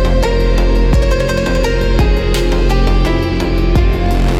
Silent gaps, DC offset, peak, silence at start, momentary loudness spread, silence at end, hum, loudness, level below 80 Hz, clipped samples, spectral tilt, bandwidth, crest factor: none; under 0.1%; -2 dBFS; 0 s; 2 LU; 0 s; none; -14 LUFS; -14 dBFS; under 0.1%; -6.5 dB/octave; 13 kHz; 8 dB